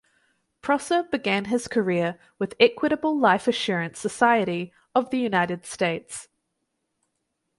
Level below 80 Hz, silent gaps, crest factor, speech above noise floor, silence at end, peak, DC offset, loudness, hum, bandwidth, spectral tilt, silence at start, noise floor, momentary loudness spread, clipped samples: -64 dBFS; none; 20 dB; 54 dB; 1.35 s; -4 dBFS; under 0.1%; -24 LUFS; none; 11.5 kHz; -4.5 dB/octave; 0.65 s; -78 dBFS; 12 LU; under 0.1%